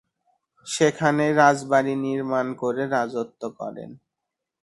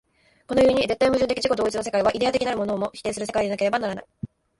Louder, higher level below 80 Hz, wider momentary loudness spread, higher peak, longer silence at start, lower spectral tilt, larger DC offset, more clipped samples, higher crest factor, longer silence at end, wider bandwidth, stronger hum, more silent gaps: about the same, -22 LUFS vs -23 LUFS; second, -66 dBFS vs -50 dBFS; first, 16 LU vs 10 LU; first, -4 dBFS vs -8 dBFS; first, 0.65 s vs 0.5 s; about the same, -5 dB/octave vs -4.5 dB/octave; neither; neither; about the same, 20 dB vs 16 dB; first, 0.7 s vs 0.35 s; about the same, 11.5 kHz vs 11.5 kHz; neither; neither